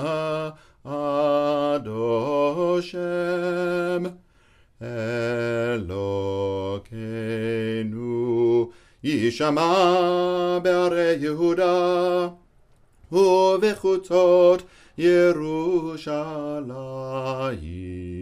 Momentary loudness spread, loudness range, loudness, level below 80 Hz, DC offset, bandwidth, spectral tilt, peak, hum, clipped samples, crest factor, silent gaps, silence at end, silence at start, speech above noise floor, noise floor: 13 LU; 7 LU; -23 LUFS; -54 dBFS; under 0.1%; 12.5 kHz; -6.5 dB/octave; -6 dBFS; none; under 0.1%; 16 dB; none; 0 s; 0 s; 36 dB; -57 dBFS